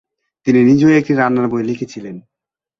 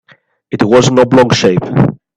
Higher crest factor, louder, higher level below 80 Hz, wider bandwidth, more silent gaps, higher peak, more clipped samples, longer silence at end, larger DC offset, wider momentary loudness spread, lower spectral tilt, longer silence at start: about the same, 14 dB vs 10 dB; second, -14 LUFS vs -10 LUFS; second, -54 dBFS vs -44 dBFS; second, 7.4 kHz vs 10.5 kHz; neither; about the same, -2 dBFS vs 0 dBFS; neither; first, 0.6 s vs 0.25 s; neither; first, 17 LU vs 6 LU; first, -7.5 dB/octave vs -6 dB/octave; about the same, 0.45 s vs 0.5 s